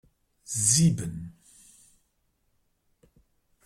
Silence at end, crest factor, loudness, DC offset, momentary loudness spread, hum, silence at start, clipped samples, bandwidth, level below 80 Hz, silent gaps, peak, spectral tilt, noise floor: 2.35 s; 22 dB; -24 LUFS; under 0.1%; 21 LU; none; 0.5 s; under 0.1%; 15.5 kHz; -60 dBFS; none; -8 dBFS; -4 dB/octave; -73 dBFS